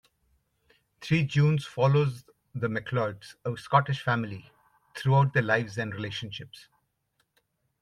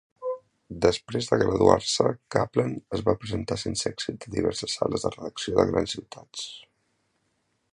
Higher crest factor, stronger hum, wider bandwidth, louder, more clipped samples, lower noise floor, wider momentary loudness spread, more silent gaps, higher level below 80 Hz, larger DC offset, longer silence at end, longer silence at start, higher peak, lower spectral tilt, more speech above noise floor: second, 20 dB vs 26 dB; neither; about the same, 11.5 kHz vs 11.5 kHz; about the same, -27 LUFS vs -26 LUFS; neither; about the same, -75 dBFS vs -73 dBFS; first, 18 LU vs 15 LU; neither; second, -64 dBFS vs -50 dBFS; neither; about the same, 1.2 s vs 1.1 s; first, 1 s vs 0.2 s; second, -8 dBFS vs -2 dBFS; first, -7 dB/octave vs -4.5 dB/octave; about the same, 49 dB vs 47 dB